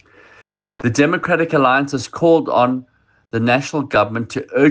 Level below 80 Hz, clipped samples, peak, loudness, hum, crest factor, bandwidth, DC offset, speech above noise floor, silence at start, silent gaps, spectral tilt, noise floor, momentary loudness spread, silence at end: -54 dBFS; under 0.1%; 0 dBFS; -17 LUFS; none; 16 dB; 9.8 kHz; under 0.1%; 35 dB; 0.8 s; none; -6 dB/octave; -51 dBFS; 9 LU; 0 s